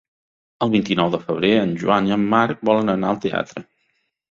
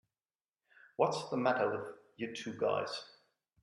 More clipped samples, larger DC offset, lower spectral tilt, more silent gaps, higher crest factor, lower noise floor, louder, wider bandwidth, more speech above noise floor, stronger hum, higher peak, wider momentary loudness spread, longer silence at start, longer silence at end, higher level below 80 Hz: neither; neither; first, -6.5 dB/octave vs -5 dB/octave; neither; about the same, 18 dB vs 22 dB; second, -69 dBFS vs under -90 dBFS; first, -19 LUFS vs -36 LUFS; second, 7.4 kHz vs 11.5 kHz; second, 50 dB vs over 55 dB; neither; first, -2 dBFS vs -16 dBFS; second, 7 LU vs 15 LU; second, 0.6 s vs 1 s; first, 0.7 s vs 0.55 s; first, -56 dBFS vs -82 dBFS